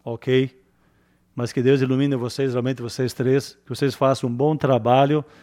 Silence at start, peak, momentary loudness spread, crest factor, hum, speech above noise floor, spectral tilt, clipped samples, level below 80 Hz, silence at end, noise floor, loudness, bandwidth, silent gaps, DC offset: 0.05 s; -4 dBFS; 9 LU; 18 dB; none; 40 dB; -7 dB/octave; under 0.1%; -62 dBFS; 0.2 s; -61 dBFS; -21 LUFS; 15 kHz; none; under 0.1%